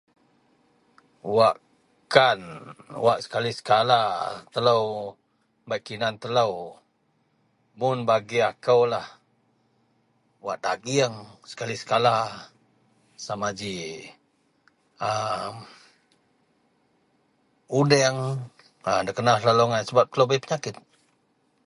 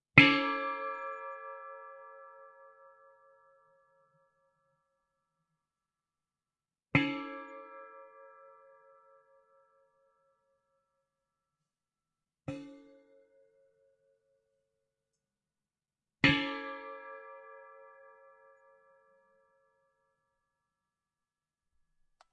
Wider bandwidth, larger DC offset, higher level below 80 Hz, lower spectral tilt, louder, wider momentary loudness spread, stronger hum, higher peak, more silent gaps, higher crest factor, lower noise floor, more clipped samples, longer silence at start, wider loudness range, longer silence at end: first, 11.5 kHz vs 8.8 kHz; neither; about the same, -66 dBFS vs -68 dBFS; second, -4.5 dB/octave vs -6 dB/octave; first, -24 LUFS vs -30 LUFS; second, 18 LU vs 26 LU; neither; first, 0 dBFS vs -4 dBFS; neither; second, 26 dB vs 34 dB; second, -69 dBFS vs under -90 dBFS; neither; first, 1.25 s vs 0.15 s; second, 10 LU vs 20 LU; second, 0.9 s vs 4.7 s